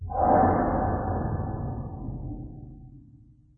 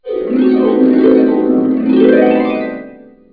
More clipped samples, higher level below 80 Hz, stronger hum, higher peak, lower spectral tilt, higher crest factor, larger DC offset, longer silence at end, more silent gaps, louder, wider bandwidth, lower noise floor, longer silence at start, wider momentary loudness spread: neither; first, -38 dBFS vs -48 dBFS; neither; second, -8 dBFS vs 0 dBFS; first, -14.5 dB/octave vs -10 dB/octave; first, 20 dB vs 10 dB; second, under 0.1% vs 0.1%; about the same, 0.4 s vs 0.4 s; neither; second, -27 LUFS vs -11 LUFS; second, 2.2 kHz vs 4.8 kHz; first, -54 dBFS vs -35 dBFS; about the same, 0 s vs 0.05 s; first, 20 LU vs 9 LU